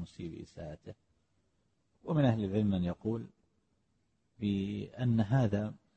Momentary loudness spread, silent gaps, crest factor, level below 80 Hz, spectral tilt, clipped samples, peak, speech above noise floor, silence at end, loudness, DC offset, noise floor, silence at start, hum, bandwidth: 18 LU; none; 18 dB; -60 dBFS; -9 dB/octave; under 0.1%; -16 dBFS; 45 dB; 0.2 s; -33 LUFS; under 0.1%; -77 dBFS; 0 s; none; 8.4 kHz